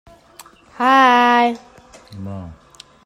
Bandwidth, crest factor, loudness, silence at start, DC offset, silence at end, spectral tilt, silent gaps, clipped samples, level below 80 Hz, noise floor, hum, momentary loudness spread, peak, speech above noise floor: 15.5 kHz; 16 dB; -14 LUFS; 0.8 s; under 0.1%; 0.5 s; -4.5 dB/octave; none; under 0.1%; -56 dBFS; -45 dBFS; none; 22 LU; -2 dBFS; 30 dB